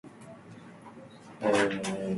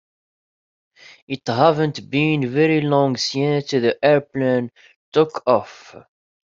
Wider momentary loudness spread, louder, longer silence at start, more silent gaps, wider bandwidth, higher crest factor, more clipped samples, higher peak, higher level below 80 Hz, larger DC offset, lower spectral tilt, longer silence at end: first, 23 LU vs 7 LU; second, -29 LUFS vs -19 LUFS; second, 0.05 s vs 1.3 s; second, none vs 4.96-5.12 s; first, 11.5 kHz vs 7.8 kHz; about the same, 20 dB vs 20 dB; neither; second, -14 dBFS vs -2 dBFS; about the same, -66 dBFS vs -62 dBFS; neither; about the same, -5 dB/octave vs -6 dB/octave; second, 0 s vs 0.5 s